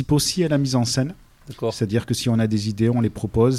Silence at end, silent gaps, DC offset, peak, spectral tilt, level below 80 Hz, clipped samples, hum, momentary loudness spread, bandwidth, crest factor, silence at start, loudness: 0 s; none; under 0.1%; -6 dBFS; -5.5 dB/octave; -44 dBFS; under 0.1%; none; 6 LU; 15 kHz; 14 dB; 0 s; -22 LUFS